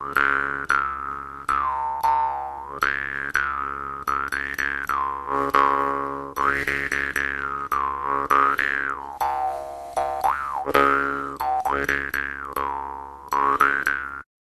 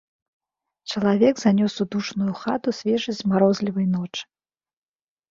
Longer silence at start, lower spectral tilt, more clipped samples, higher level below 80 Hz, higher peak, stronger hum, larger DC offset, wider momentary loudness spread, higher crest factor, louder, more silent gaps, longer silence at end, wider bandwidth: second, 0 s vs 0.85 s; second, -4 dB/octave vs -6.5 dB/octave; neither; first, -48 dBFS vs -62 dBFS; first, 0 dBFS vs -4 dBFS; neither; neither; about the same, 10 LU vs 10 LU; first, 24 dB vs 18 dB; about the same, -23 LUFS vs -22 LUFS; neither; second, 0.35 s vs 1.05 s; first, 13.5 kHz vs 7.4 kHz